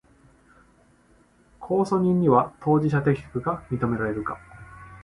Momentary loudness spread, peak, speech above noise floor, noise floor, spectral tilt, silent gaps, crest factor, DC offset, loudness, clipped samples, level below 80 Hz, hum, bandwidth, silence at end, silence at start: 23 LU; -6 dBFS; 36 dB; -59 dBFS; -9 dB/octave; none; 20 dB; under 0.1%; -24 LUFS; under 0.1%; -52 dBFS; none; 11.5 kHz; 0 s; 1.6 s